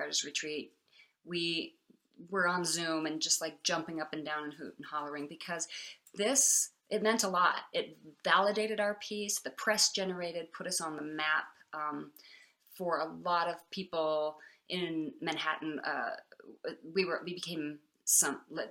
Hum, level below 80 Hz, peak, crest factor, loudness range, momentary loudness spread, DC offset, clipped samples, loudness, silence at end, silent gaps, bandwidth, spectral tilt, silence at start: none; -84 dBFS; -12 dBFS; 22 dB; 6 LU; 14 LU; under 0.1%; under 0.1%; -33 LUFS; 0 s; none; over 20 kHz; -1.5 dB/octave; 0 s